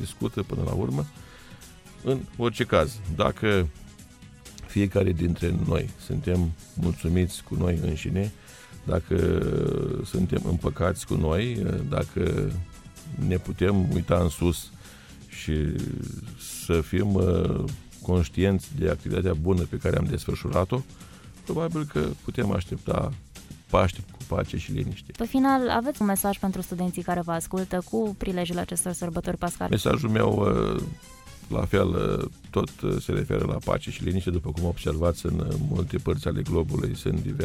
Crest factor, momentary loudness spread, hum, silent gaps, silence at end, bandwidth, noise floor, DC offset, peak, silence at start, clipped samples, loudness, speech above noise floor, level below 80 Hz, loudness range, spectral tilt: 20 dB; 13 LU; none; none; 0 s; 16.5 kHz; -48 dBFS; under 0.1%; -6 dBFS; 0 s; under 0.1%; -27 LUFS; 22 dB; -40 dBFS; 2 LU; -6.5 dB/octave